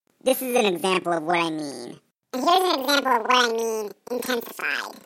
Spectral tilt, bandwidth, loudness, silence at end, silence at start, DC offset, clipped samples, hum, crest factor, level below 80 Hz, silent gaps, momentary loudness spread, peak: -3 dB/octave; 16.5 kHz; -23 LUFS; 0.05 s; 0.25 s; under 0.1%; under 0.1%; none; 18 dB; -76 dBFS; none; 12 LU; -6 dBFS